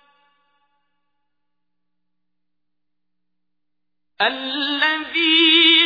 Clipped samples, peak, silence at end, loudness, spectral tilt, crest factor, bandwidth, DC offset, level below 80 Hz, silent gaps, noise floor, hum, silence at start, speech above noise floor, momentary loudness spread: under 0.1%; -2 dBFS; 0 s; -16 LUFS; -2.5 dB/octave; 20 dB; 5 kHz; under 0.1%; -70 dBFS; none; -84 dBFS; 60 Hz at -80 dBFS; 4.2 s; 64 dB; 11 LU